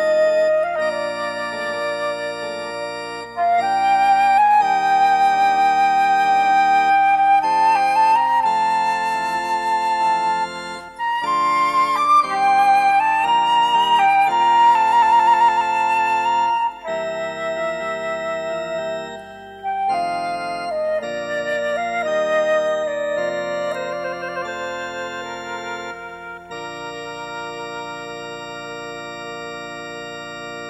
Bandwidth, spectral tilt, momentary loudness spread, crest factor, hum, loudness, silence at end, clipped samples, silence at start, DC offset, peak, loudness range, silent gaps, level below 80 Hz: 12.5 kHz; -3 dB/octave; 16 LU; 12 dB; none; -18 LUFS; 0 s; under 0.1%; 0 s; under 0.1%; -6 dBFS; 14 LU; none; -58 dBFS